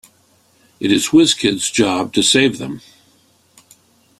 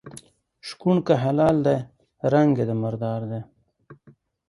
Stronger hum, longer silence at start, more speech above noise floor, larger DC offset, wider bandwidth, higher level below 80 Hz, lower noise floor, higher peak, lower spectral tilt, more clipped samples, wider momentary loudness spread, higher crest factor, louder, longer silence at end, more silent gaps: neither; first, 0.8 s vs 0.05 s; first, 40 dB vs 35 dB; neither; first, 14.5 kHz vs 11.5 kHz; about the same, -54 dBFS vs -58 dBFS; about the same, -55 dBFS vs -56 dBFS; first, 0 dBFS vs -6 dBFS; second, -3 dB/octave vs -8 dB/octave; neither; second, 15 LU vs 19 LU; about the same, 18 dB vs 18 dB; first, -14 LUFS vs -22 LUFS; first, 1.4 s vs 0.55 s; neither